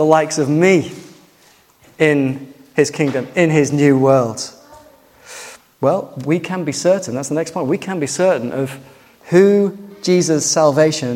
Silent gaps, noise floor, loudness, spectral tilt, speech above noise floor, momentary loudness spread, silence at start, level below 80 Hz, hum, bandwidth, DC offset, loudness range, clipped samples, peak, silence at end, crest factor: none; -51 dBFS; -16 LUFS; -5 dB/octave; 36 dB; 16 LU; 0 s; -60 dBFS; none; 16.5 kHz; under 0.1%; 4 LU; under 0.1%; 0 dBFS; 0 s; 16 dB